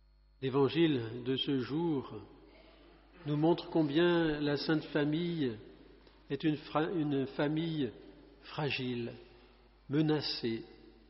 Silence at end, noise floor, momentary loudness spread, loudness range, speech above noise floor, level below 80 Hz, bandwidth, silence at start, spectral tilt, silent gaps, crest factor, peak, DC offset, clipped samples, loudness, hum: 0.2 s; -61 dBFS; 14 LU; 4 LU; 29 dB; -62 dBFS; 5.8 kHz; 0.4 s; -5 dB/octave; none; 16 dB; -18 dBFS; under 0.1%; under 0.1%; -33 LUFS; none